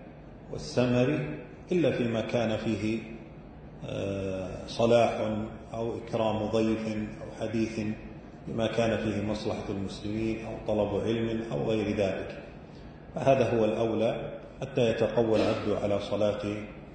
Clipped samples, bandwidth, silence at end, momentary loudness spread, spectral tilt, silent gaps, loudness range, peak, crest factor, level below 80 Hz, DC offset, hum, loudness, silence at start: under 0.1%; 9.2 kHz; 0 s; 16 LU; -6.5 dB/octave; none; 4 LU; -10 dBFS; 20 dB; -52 dBFS; under 0.1%; none; -29 LUFS; 0 s